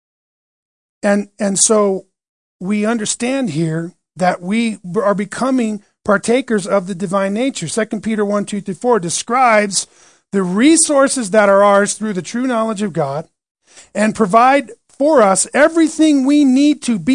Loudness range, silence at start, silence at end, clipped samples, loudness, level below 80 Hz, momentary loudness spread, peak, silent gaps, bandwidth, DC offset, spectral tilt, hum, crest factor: 5 LU; 1.05 s; 0 s; under 0.1%; -15 LUFS; -58 dBFS; 10 LU; 0 dBFS; 2.29-2.59 s, 13.51-13.55 s; 10.5 kHz; 0.1%; -4 dB/octave; none; 16 dB